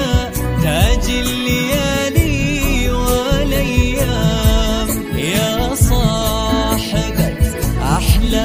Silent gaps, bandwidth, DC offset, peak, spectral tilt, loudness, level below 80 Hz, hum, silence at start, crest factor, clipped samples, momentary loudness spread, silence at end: none; 16 kHz; under 0.1%; 0 dBFS; -5 dB/octave; -16 LUFS; -20 dBFS; none; 0 s; 14 dB; under 0.1%; 3 LU; 0 s